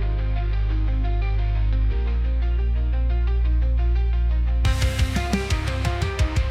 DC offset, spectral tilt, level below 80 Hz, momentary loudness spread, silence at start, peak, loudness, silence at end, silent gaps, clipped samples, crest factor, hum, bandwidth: under 0.1%; -6 dB/octave; -22 dBFS; 2 LU; 0 s; -10 dBFS; -24 LUFS; 0 s; none; under 0.1%; 10 dB; none; 11 kHz